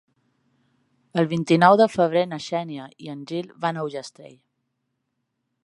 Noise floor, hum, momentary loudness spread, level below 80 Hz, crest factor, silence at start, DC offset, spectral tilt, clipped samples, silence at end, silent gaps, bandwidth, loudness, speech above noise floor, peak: -77 dBFS; none; 20 LU; -70 dBFS; 22 dB; 1.15 s; under 0.1%; -6.5 dB/octave; under 0.1%; 1.35 s; none; 11.5 kHz; -21 LUFS; 55 dB; -2 dBFS